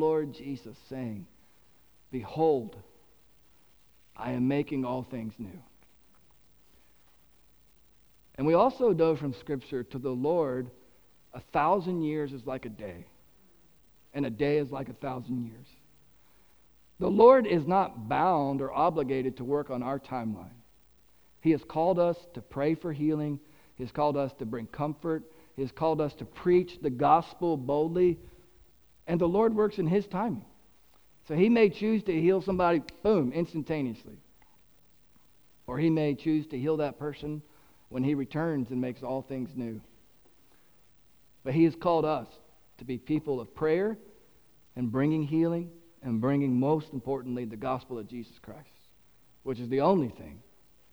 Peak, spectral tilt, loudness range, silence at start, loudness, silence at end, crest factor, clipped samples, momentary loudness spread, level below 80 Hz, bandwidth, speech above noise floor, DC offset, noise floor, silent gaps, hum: -8 dBFS; -8.5 dB/octave; 8 LU; 0 s; -29 LUFS; 0.55 s; 22 dB; under 0.1%; 16 LU; -60 dBFS; over 20 kHz; 36 dB; under 0.1%; -64 dBFS; none; none